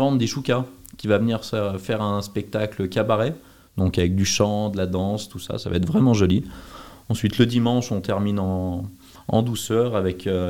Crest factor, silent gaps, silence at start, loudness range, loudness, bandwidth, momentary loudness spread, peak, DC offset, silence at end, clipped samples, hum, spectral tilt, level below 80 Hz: 20 dB; none; 0 s; 2 LU; -23 LUFS; 17.5 kHz; 13 LU; -2 dBFS; 0.3%; 0 s; under 0.1%; none; -6 dB/octave; -50 dBFS